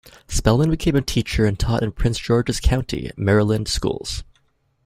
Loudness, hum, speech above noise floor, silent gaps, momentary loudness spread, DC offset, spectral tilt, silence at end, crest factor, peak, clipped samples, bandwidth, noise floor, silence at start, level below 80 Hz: -21 LUFS; none; 44 dB; none; 9 LU; under 0.1%; -5.5 dB/octave; 0.6 s; 18 dB; -2 dBFS; under 0.1%; 15.5 kHz; -63 dBFS; 0.3 s; -30 dBFS